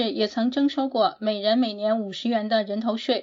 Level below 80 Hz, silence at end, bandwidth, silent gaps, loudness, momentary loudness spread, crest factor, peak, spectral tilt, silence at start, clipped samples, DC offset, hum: -72 dBFS; 0 s; 7.6 kHz; none; -24 LUFS; 3 LU; 16 dB; -8 dBFS; -5.5 dB/octave; 0 s; under 0.1%; under 0.1%; none